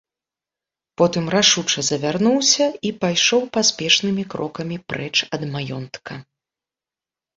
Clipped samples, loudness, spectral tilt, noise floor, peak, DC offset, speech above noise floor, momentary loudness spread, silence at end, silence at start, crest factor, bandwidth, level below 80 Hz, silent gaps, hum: under 0.1%; -19 LUFS; -3 dB/octave; -90 dBFS; -2 dBFS; under 0.1%; 70 dB; 14 LU; 1.15 s; 1 s; 20 dB; 8 kHz; -60 dBFS; none; none